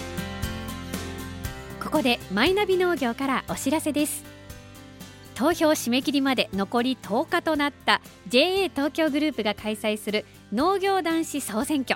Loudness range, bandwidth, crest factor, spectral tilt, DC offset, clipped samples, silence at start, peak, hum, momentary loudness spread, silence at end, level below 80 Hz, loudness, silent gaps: 2 LU; 17 kHz; 22 dB; -4 dB/octave; under 0.1%; under 0.1%; 0 s; -4 dBFS; none; 13 LU; 0 s; -48 dBFS; -25 LUFS; none